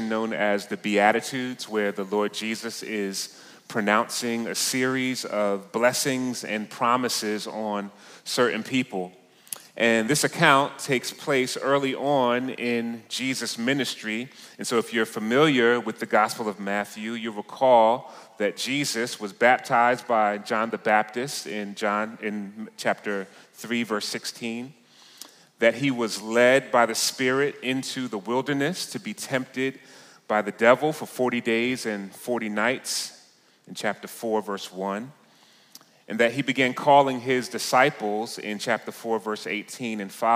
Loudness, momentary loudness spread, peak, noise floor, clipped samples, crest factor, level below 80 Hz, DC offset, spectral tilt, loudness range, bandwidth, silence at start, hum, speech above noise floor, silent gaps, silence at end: -25 LUFS; 13 LU; -4 dBFS; -57 dBFS; under 0.1%; 22 dB; -74 dBFS; under 0.1%; -3.5 dB/octave; 6 LU; 16 kHz; 0 s; none; 32 dB; none; 0 s